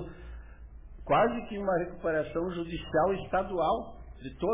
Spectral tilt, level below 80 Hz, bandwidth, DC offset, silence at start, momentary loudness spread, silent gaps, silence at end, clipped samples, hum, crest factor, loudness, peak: -5 dB/octave; -48 dBFS; 3.8 kHz; under 0.1%; 0 s; 21 LU; none; 0 s; under 0.1%; none; 16 dB; -30 LUFS; -16 dBFS